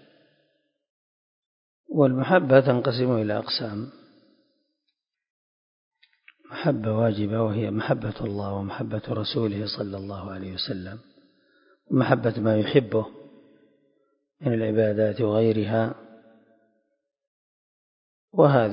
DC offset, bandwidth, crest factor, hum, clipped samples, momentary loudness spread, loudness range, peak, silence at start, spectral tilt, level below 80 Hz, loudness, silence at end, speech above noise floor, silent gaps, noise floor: under 0.1%; 5.4 kHz; 24 dB; none; under 0.1%; 14 LU; 7 LU; -2 dBFS; 1.9 s; -11 dB/octave; -58 dBFS; -24 LUFS; 0 s; 57 dB; 5.30-5.91 s, 17.27-18.28 s; -80 dBFS